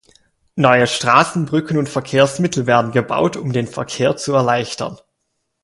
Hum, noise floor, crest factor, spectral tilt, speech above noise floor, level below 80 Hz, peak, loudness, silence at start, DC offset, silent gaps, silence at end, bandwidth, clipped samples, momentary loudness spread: none; -72 dBFS; 18 dB; -5 dB/octave; 56 dB; -54 dBFS; 0 dBFS; -16 LUFS; 0.55 s; under 0.1%; none; 0.65 s; 11.5 kHz; under 0.1%; 10 LU